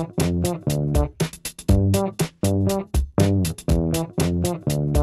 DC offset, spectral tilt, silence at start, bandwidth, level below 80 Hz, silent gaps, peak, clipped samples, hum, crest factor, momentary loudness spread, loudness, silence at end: under 0.1%; -6.5 dB/octave; 0 s; 14.5 kHz; -30 dBFS; none; -4 dBFS; under 0.1%; none; 16 dB; 5 LU; -22 LUFS; 0 s